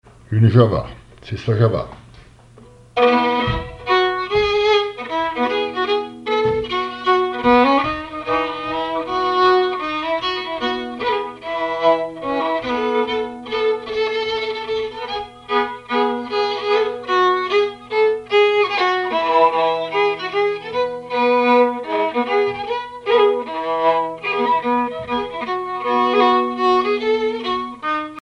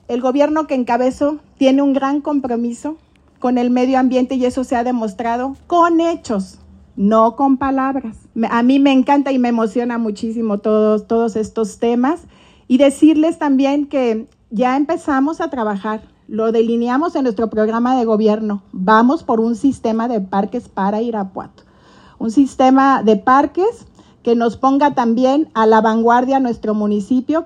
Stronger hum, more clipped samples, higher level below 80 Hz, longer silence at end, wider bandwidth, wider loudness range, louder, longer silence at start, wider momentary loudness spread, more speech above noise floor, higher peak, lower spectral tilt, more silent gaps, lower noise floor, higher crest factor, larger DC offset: neither; neither; first, -46 dBFS vs -52 dBFS; about the same, 0 s vs 0 s; about the same, 10 kHz vs 9.4 kHz; about the same, 4 LU vs 3 LU; second, -19 LUFS vs -16 LUFS; first, 0.3 s vs 0.1 s; about the same, 9 LU vs 10 LU; about the same, 29 dB vs 31 dB; about the same, -2 dBFS vs 0 dBFS; about the same, -6.5 dB/octave vs -6.5 dB/octave; neither; about the same, -45 dBFS vs -46 dBFS; about the same, 16 dB vs 14 dB; neither